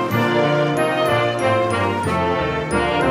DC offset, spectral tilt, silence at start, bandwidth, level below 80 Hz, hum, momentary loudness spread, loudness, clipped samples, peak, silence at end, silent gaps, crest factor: under 0.1%; -6 dB/octave; 0 s; 15.5 kHz; -42 dBFS; none; 3 LU; -19 LUFS; under 0.1%; -6 dBFS; 0 s; none; 12 dB